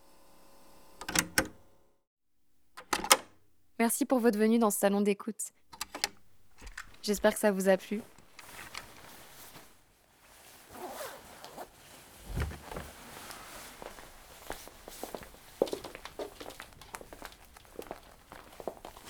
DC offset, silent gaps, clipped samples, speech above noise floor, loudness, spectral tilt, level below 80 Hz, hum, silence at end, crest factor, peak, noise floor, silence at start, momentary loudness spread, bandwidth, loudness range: under 0.1%; 2.07-2.17 s; under 0.1%; 43 dB; -32 LUFS; -3.5 dB/octave; -56 dBFS; none; 0 s; 34 dB; -2 dBFS; -71 dBFS; 1 s; 24 LU; over 20 kHz; 17 LU